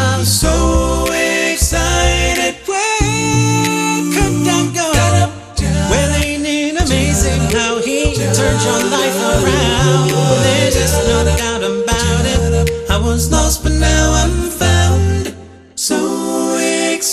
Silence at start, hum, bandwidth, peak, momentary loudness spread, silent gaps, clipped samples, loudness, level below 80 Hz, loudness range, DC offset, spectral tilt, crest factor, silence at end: 0 s; none; 13.5 kHz; 0 dBFS; 4 LU; none; under 0.1%; -14 LUFS; -22 dBFS; 2 LU; under 0.1%; -4 dB/octave; 14 dB; 0 s